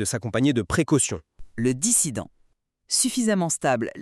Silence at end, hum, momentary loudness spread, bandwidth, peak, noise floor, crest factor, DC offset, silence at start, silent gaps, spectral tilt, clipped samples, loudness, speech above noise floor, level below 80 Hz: 0 s; none; 7 LU; 13 kHz; -6 dBFS; -65 dBFS; 18 dB; under 0.1%; 0 s; none; -4 dB/octave; under 0.1%; -22 LUFS; 41 dB; -52 dBFS